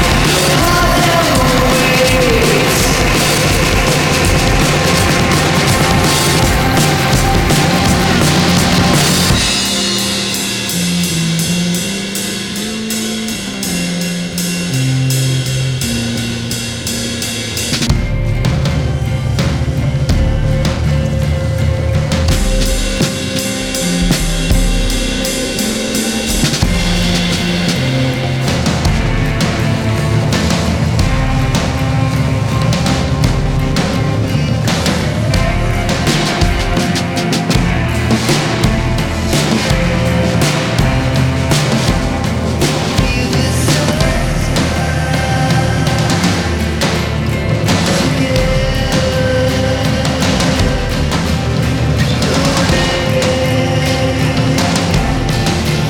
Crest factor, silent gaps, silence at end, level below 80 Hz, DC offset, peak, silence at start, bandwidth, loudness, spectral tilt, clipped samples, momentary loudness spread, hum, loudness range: 12 dB; none; 0 s; -22 dBFS; under 0.1%; 0 dBFS; 0 s; over 20 kHz; -13 LUFS; -4.5 dB/octave; under 0.1%; 6 LU; none; 5 LU